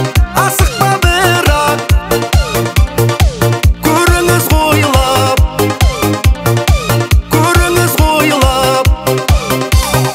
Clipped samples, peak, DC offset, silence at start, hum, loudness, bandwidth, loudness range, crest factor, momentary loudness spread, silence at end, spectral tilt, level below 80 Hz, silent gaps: under 0.1%; 0 dBFS; under 0.1%; 0 s; none; -11 LUFS; 16.5 kHz; 1 LU; 10 dB; 3 LU; 0 s; -4.5 dB/octave; -16 dBFS; none